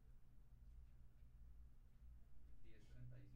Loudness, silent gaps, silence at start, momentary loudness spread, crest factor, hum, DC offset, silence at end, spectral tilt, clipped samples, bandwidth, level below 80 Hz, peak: -67 LUFS; none; 0 s; 7 LU; 14 dB; none; under 0.1%; 0 s; -7.5 dB/octave; under 0.1%; 5.6 kHz; -64 dBFS; -46 dBFS